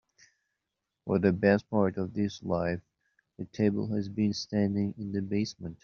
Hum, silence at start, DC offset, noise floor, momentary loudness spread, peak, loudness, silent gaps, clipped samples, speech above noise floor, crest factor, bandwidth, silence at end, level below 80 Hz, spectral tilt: none; 1.05 s; under 0.1%; -86 dBFS; 10 LU; -10 dBFS; -30 LUFS; none; under 0.1%; 57 dB; 20 dB; 7 kHz; 0.1 s; -64 dBFS; -6.5 dB/octave